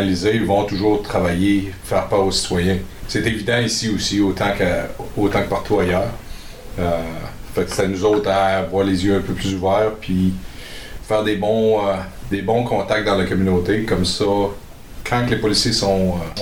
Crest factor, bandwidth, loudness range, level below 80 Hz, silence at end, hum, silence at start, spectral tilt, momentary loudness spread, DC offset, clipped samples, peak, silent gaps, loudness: 16 dB; 18 kHz; 2 LU; -36 dBFS; 0 s; none; 0 s; -5 dB/octave; 9 LU; 0.8%; under 0.1%; -4 dBFS; none; -19 LUFS